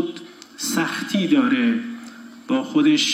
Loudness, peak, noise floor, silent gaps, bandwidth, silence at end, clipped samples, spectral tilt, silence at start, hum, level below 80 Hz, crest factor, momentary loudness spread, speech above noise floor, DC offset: -21 LUFS; -6 dBFS; -40 dBFS; none; 16 kHz; 0 s; under 0.1%; -3.5 dB/octave; 0 s; none; -78 dBFS; 14 dB; 21 LU; 21 dB; under 0.1%